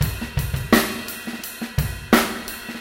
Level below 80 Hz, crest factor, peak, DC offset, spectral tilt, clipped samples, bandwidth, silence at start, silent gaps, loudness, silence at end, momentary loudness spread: -34 dBFS; 22 dB; 0 dBFS; under 0.1%; -4.5 dB/octave; under 0.1%; 17 kHz; 0 s; none; -23 LUFS; 0 s; 12 LU